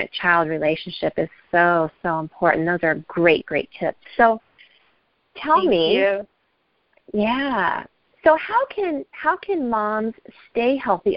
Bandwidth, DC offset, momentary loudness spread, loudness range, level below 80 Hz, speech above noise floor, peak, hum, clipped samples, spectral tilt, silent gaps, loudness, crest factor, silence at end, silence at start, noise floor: 5.6 kHz; under 0.1%; 10 LU; 2 LU; -56 dBFS; 47 dB; 0 dBFS; none; under 0.1%; -10 dB/octave; none; -21 LUFS; 20 dB; 0 s; 0 s; -68 dBFS